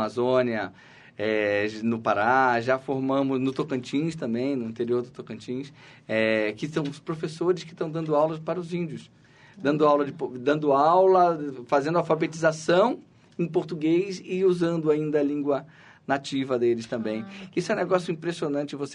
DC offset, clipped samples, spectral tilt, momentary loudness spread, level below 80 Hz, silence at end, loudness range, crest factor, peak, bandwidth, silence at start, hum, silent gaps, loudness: under 0.1%; under 0.1%; -6.5 dB/octave; 11 LU; -68 dBFS; 0 s; 6 LU; 18 dB; -8 dBFS; 10.5 kHz; 0 s; none; none; -25 LUFS